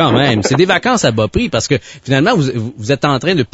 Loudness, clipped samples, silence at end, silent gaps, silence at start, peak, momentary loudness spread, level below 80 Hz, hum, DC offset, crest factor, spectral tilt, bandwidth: -14 LUFS; under 0.1%; 0.1 s; none; 0 s; 0 dBFS; 6 LU; -38 dBFS; none; under 0.1%; 14 dB; -5 dB/octave; 8 kHz